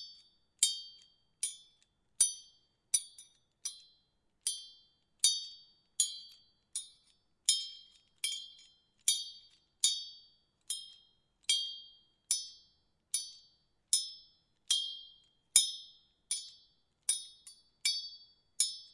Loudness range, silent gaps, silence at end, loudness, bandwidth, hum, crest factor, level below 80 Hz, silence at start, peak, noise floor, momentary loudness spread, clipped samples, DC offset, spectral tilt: 4 LU; none; 0.05 s; -33 LUFS; 12 kHz; none; 32 dB; -78 dBFS; 0 s; -8 dBFS; -76 dBFS; 22 LU; under 0.1%; under 0.1%; 4.5 dB/octave